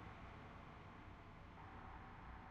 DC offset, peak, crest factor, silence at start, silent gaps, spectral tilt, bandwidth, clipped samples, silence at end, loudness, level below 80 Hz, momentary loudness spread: under 0.1%; -44 dBFS; 12 dB; 0 s; none; -5 dB/octave; 7.6 kHz; under 0.1%; 0 s; -58 LUFS; -62 dBFS; 3 LU